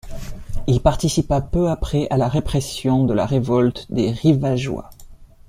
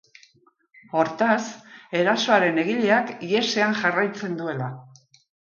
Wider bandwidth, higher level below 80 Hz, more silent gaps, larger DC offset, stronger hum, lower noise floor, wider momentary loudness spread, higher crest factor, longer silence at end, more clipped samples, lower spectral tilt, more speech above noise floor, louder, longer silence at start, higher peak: first, 15.5 kHz vs 7.4 kHz; first, -32 dBFS vs -72 dBFS; neither; neither; neither; second, -41 dBFS vs -61 dBFS; about the same, 10 LU vs 12 LU; about the same, 18 dB vs 18 dB; second, 0.25 s vs 0.6 s; neither; first, -7 dB/octave vs -4.5 dB/octave; second, 23 dB vs 39 dB; about the same, -20 LUFS vs -22 LUFS; second, 0.05 s vs 0.95 s; first, -2 dBFS vs -6 dBFS